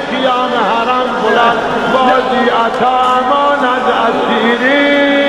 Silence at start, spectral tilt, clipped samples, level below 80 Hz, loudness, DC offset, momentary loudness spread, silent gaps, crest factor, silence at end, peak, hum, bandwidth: 0 s; -4.5 dB/octave; under 0.1%; -44 dBFS; -11 LUFS; under 0.1%; 3 LU; none; 12 dB; 0 s; 0 dBFS; none; 12.5 kHz